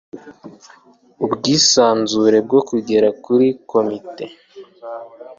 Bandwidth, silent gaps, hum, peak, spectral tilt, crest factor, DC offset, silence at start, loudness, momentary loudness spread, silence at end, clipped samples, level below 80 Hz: 7.6 kHz; none; none; -2 dBFS; -3.5 dB/octave; 16 dB; under 0.1%; 0.15 s; -15 LUFS; 21 LU; 0.05 s; under 0.1%; -60 dBFS